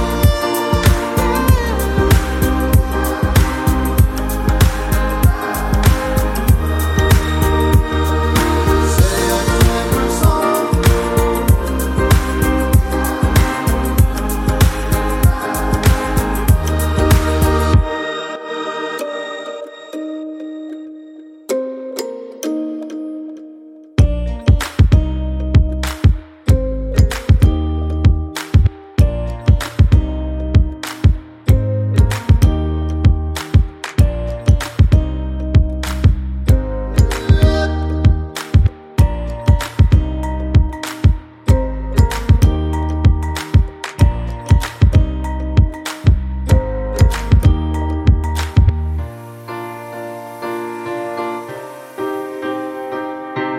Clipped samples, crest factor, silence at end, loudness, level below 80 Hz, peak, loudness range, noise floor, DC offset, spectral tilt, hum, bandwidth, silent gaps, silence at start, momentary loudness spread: under 0.1%; 14 dB; 0 s; -16 LUFS; -18 dBFS; 0 dBFS; 9 LU; -38 dBFS; under 0.1%; -6 dB/octave; none; 16.5 kHz; none; 0 s; 11 LU